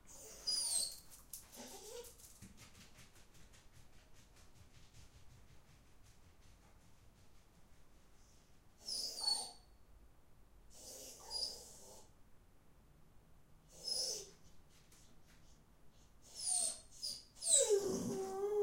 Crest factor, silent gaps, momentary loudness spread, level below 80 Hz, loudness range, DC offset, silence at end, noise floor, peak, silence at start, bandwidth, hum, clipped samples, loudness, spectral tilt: 28 dB; none; 24 LU; -68 dBFS; 26 LU; under 0.1%; 0 s; -64 dBFS; -16 dBFS; 0.05 s; 16 kHz; none; under 0.1%; -39 LUFS; -1.5 dB/octave